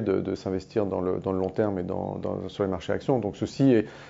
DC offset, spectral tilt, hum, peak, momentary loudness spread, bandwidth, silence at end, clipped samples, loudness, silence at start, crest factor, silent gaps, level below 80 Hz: under 0.1%; -8 dB/octave; none; -10 dBFS; 9 LU; 7.8 kHz; 0 s; under 0.1%; -27 LUFS; 0 s; 18 dB; none; -58 dBFS